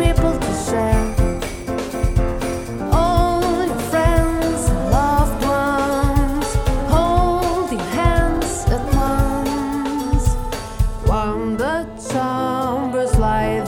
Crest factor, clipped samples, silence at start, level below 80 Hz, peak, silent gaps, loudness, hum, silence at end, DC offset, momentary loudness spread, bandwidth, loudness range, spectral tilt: 16 dB; under 0.1%; 0 s; -22 dBFS; -2 dBFS; none; -19 LUFS; none; 0 s; 0.1%; 6 LU; 17.5 kHz; 3 LU; -6 dB/octave